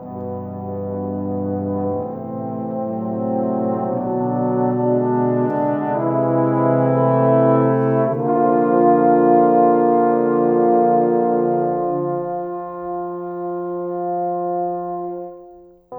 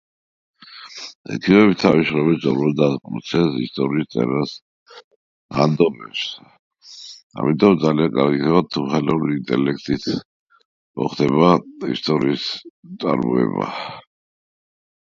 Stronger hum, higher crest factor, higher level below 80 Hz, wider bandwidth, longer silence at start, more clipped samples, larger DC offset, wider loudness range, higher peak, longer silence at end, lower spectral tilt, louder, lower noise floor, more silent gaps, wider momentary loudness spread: neither; about the same, 16 dB vs 20 dB; second, -62 dBFS vs -54 dBFS; second, 3.4 kHz vs 7.6 kHz; second, 0 s vs 0.7 s; neither; neither; first, 9 LU vs 5 LU; about the same, -2 dBFS vs 0 dBFS; second, 0 s vs 1.15 s; first, -12.5 dB/octave vs -7 dB/octave; about the same, -19 LUFS vs -19 LUFS; first, -44 dBFS vs -39 dBFS; second, none vs 1.15-1.25 s, 4.62-4.86 s, 5.04-5.49 s, 6.59-6.71 s, 7.23-7.30 s, 10.25-10.47 s, 10.65-10.94 s, 12.70-12.83 s; second, 13 LU vs 19 LU